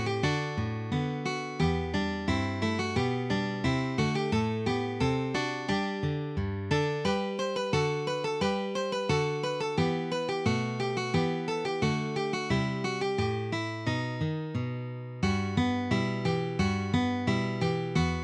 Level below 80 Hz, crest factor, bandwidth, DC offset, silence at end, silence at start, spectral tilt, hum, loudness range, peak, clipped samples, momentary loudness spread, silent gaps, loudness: -50 dBFS; 16 dB; 10.5 kHz; under 0.1%; 0 s; 0 s; -6 dB/octave; none; 1 LU; -14 dBFS; under 0.1%; 4 LU; none; -30 LUFS